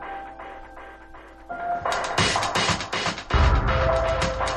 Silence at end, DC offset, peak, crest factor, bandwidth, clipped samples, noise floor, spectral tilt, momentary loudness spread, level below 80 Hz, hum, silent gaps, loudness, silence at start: 0 s; under 0.1%; -8 dBFS; 18 dB; 12 kHz; under 0.1%; -44 dBFS; -4 dB/octave; 20 LU; -30 dBFS; none; none; -23 LUFS; 0 s